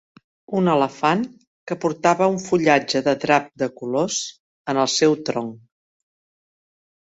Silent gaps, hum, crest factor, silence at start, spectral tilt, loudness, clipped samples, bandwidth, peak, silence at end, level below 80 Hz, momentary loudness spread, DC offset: 1.47-1.67 s, 4.40-4.65 s; none; 20 dB; 0.5 s; -4.5 dB/octave; -20 LUFS; under 0.1%; 8.2 kHz; -2 dBFS; 1.45 s; -64 dBFS; 11 LU; under 0.1%